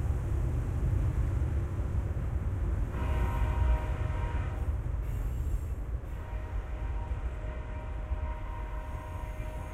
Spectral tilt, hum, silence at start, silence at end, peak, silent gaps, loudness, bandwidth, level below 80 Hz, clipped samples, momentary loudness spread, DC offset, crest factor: -8 dB/octave; none; 0 s; 0 s; -18 dBFS; none; -35 LUFS; 13 kHz; -34 dBFS; under 0.1%; 9 LU; under 0.1%; 14 dB